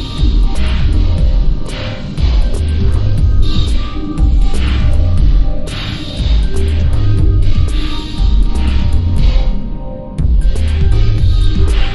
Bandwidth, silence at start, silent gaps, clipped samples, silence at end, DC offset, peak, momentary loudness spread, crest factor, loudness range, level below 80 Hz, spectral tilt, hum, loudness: 11.5 kHz; 0 s; none; under 0.1%; 0 s; under 0.1%; 0 dBFS; 7 LU; 10 dB; 1 LU; -12 dBFS; -7 dB/octave; none; -15 LUFS